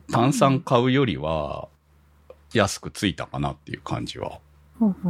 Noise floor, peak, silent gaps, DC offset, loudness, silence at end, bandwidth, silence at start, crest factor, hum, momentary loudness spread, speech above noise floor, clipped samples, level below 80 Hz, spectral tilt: -57 dBFS; -2 dBFS; none; under 0.1%; -24 LUFS; 0 s; 15.5 kHz; 0.1 s; 22 dB; none; 15 LU; 34 dB; under 0.1%; -48 dBFS; -5.5 dB/octave